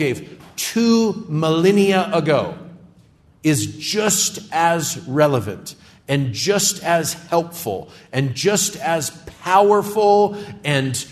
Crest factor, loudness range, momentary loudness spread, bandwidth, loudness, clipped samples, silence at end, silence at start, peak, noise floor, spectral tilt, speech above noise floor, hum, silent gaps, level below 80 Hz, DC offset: 16 dB; 2 LU; 12 LU; 14 kHz; -18 LUFS; under 0.1%; 0 s; 0 s; -2 dBFS; -52 dBFS; -4 dB/octave; 33 dB; none; none; -58 dBFS; under 0.1%